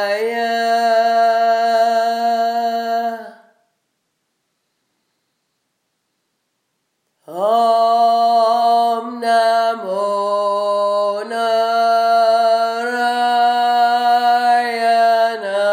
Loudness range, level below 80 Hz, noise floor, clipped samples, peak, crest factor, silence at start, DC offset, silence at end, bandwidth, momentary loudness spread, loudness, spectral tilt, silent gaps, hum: 8 LU; -88 dBFS; -71 dBFS; under 0.1%; -4 dBFS; 12 dB; 0 s; under 0.1%; 0 s; 15.5 kHz; 6 LU; -16 LUFS; -2.5 dB/octave; none; none